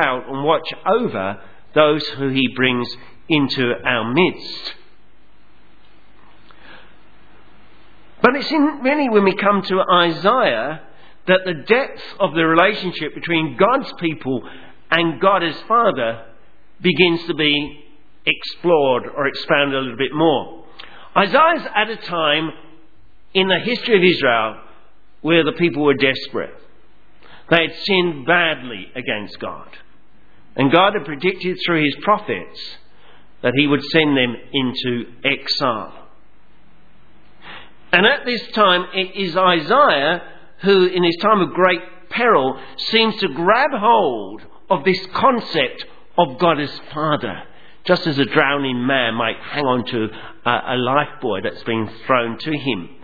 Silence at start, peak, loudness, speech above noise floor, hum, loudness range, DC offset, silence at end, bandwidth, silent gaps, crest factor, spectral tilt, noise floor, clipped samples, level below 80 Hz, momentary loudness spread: 0 s; 0 dBFS; -17 LUFS; 37 dB; none; 4 LU; 1%; 0.15 s; 5.4 kHz; none; 18 dB; -7 dB/octave; -55 dBFS; under 0.1%; -56 dBFS; 13 LU